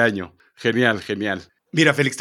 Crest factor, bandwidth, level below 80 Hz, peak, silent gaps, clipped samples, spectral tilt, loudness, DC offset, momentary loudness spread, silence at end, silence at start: 20 dB; 15 kHz; -62 dBFS; -2 dBFS; none; under 0.1%; -5 dB/octave; -20 LUFS; under 0.1%; 14 LU; 0 s; 0 s